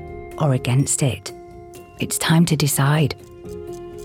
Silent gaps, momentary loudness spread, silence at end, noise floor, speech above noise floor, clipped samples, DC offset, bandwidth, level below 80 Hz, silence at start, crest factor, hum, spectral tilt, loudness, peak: none; 21 LU; 0 s; -40 dBFS; 21 dB; under 0.1%; under 0.1%; 17 kHz; -48 dBFS; 0 s; 16 dB; none; -5 dB/octave; -19 LUFS; -4 dBFS